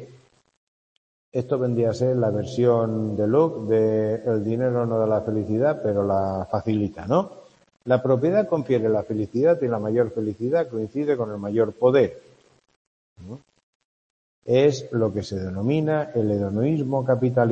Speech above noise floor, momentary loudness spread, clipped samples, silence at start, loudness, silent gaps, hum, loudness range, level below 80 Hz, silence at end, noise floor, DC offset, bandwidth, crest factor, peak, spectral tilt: 32 dB; 7 LU; under 0.1%; 0 s; -23 LUFS; 0.57-1.32 s, 12.76-13.16 s, 13.63-14.42 s; none; 4 LU; -60 dBFS; 0 s; -53 dBFS; under 0.1%; 8.4 kHz; 18 dB; -4 dBFS; -8.5 dB/octave